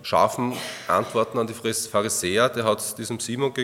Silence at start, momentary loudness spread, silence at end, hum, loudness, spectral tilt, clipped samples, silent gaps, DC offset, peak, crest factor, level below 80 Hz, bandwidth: 0 s; 7 LU; 0 s; none; -24 LUFS; -3.5 dB/octave; under 0.1%; none; under 0.1%; -6 dBFS; 18 dB; -66 dBFS; 17.5 kHz